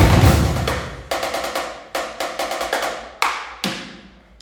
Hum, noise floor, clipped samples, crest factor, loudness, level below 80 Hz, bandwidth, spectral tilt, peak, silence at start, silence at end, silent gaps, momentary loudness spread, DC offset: none; -43 dBFS; under 0.1%; 20 dB; -21 LUFS; -28 dBFS; over 20 kHz; -5 dB/octave; 0 dBFS; 0 s; 0.35 s; none; 12 LU; under 0.1%